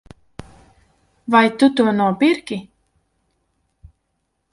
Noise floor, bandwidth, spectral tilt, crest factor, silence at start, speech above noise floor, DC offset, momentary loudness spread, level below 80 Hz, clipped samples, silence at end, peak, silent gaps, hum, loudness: -72 dBFS; 11.5 kHz; -6 dB/octave; 20 dB; 1.3 s; 56 dB; under 0.1%; 17 LU; -56 dBFS; under 0.1%; 1.9 s; 0 dBFS; none; none; -17 LUFS